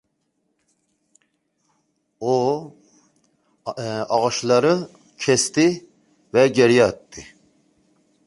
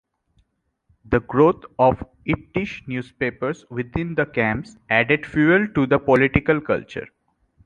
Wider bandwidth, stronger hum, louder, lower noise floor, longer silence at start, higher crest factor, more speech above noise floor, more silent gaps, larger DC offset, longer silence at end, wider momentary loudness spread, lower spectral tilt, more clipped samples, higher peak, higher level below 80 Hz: first, 11.5 kHz vs 9.2 kHz; neither; about the same, -19 LUFS vs -21 LUFS; about the same, -72 dBFS vs -69 dBFS; first, 2.2 s vs 1.1 s; about the same, 20 dB vs 20 dB; first, 53 dB vs 48 dB; neither; neither; first, 1.05 s vs 0.6 s; first, 19 LU vs 12 LU; second, -4.5 dB/octave vs -8 dB/octave; neither; about the same, -2 dBFS vs -2 dBFS; second, -60 dBFS vs -44 dBFS